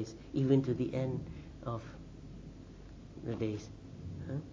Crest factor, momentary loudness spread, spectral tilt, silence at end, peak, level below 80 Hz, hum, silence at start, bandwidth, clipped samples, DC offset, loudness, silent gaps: 22 dB; 21 LU; -8.5 dB/octave; 0 s; -16 dBFS; -54 dBFS; none; 0 s; 7.6 kHz; under 0.1%; under 0.1%; -36 LUFS; none